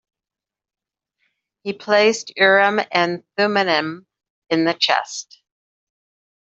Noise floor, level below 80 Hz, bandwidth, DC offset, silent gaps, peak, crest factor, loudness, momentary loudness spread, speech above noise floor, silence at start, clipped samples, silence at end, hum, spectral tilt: -89 dBFS; -72 dBFS; 8 kHz; under 0.1%; 4.30-4.42 s; -2 dBFS; 18 dB; -18 LUFS; 16 LU; 71 dB; 1.65 s; under 0.1%; 1.25 s; none; -3.5 dB/octave